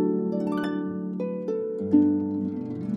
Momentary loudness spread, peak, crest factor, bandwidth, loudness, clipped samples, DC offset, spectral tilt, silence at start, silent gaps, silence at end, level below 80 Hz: 9 LU; -8 dBFS; 18 dB; 5.6 kHz; -27 LUFS; under 0.1%; under 0.1%; -9.5 dB/octave; 0 s; none; 0 s; -70 dBFS